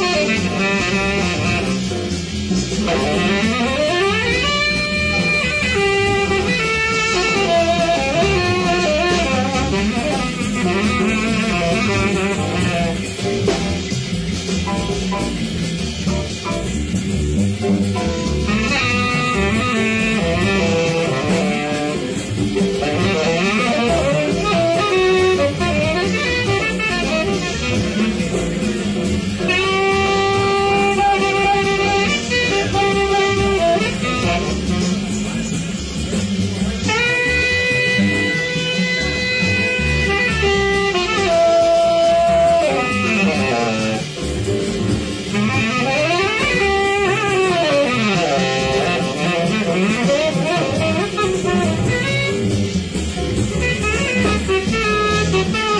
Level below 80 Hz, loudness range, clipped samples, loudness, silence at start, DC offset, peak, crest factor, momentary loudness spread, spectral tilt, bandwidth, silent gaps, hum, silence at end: -32 dBFS; 3 LU; under 0.1%; -17 LUFS; 0 s; under 0.1%; -4 dBFS; 12 dB; 6 LU; -4.5 dB/octave; 10.5 kHz; none; none; 0 s